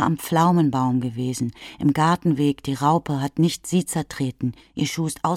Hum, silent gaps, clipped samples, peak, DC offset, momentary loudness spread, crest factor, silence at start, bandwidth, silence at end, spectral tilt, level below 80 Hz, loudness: none; none; under 0.1%; -6 dBFS; under 0.1%; 9 LU; 16 dB; 0 s; 16 kHz; 0 s; -6 dB/octave; -54 dBFS; -22 LUFS